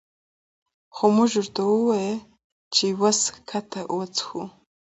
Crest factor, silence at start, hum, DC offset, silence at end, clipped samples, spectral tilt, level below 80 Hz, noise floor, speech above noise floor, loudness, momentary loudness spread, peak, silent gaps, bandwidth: 20 dB; 0.95 s; none; under 0.1%; 0.45 s; under 0.1%; -3.5 dB/octave; -68 dBFS; under -90 dBFS; over 67 dB; -23 LUFS; 13 LU; -4 dBFS; 2.44-2.71 s; 8.2 kHz